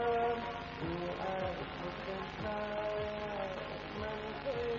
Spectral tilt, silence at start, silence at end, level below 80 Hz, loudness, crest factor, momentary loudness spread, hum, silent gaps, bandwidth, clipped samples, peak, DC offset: -6.5 dB/octave; 0 s; 0 s; -56 dBFS; -39 LUFS; 16 dB; 5 LU; 50 Hz at -55 dBFS; none; 7.4 kHz; under 0.1%; -22 dBFS; under 0.1%